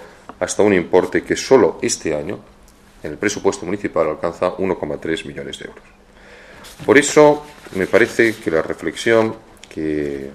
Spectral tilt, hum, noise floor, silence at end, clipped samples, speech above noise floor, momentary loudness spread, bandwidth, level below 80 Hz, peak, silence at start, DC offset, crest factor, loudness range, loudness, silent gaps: -4.5 dB/octave; none; -47 dBFS; 0 s; under 0.1%; 29 dB; 16 LU; 14 kHz; -48 dBFS; 0 dBFS; 0 s; under 0.1%; 18 dB; 6 LU; -17 LUFS; none